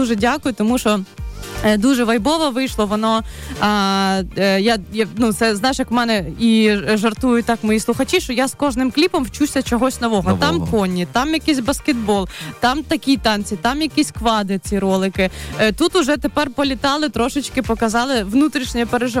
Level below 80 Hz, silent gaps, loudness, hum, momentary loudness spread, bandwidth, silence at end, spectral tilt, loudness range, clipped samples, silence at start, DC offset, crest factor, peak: -36 dBFS; none; -18 LUFS; none; 4 LU; 16.5 kHz; 0 s; -4.5 dB/octave; 2 LU; under 0.1%; 0 s; under 0.1%; 12 dB; -6 dBFS